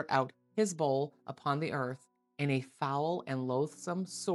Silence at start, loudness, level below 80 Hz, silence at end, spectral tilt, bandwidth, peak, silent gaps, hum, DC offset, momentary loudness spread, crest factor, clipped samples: 0 s; -35 LUFS; -86 dBFS; 0 s; -5.5 dB/octave; 12 kHz; -14 dBFS; none; none; under 0.1%; 7 LU; 20 dB; under 0.1%